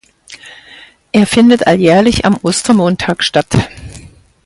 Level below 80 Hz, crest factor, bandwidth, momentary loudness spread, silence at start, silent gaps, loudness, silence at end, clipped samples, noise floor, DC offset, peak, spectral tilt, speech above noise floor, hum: -36 dBFS; 12 dB; 11.5 kHz; 15 LU; 0.3 s; none; -11 LUFS; 0.5 s; under 0.1%; -39 dBFS; under 0.1%; 0 dBFS; -5 dB/octave; 29 dB; none